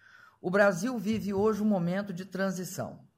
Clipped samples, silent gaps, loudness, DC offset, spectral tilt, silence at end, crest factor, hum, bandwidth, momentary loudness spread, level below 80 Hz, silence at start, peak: under 0.1%; none; -30 LUFS; under 0.1%; -6 dB/octave; 0.2 s; 18 dB; none; 16 kHz; 12 LU; -64 dBFS; 0.45 s; -12 dBFS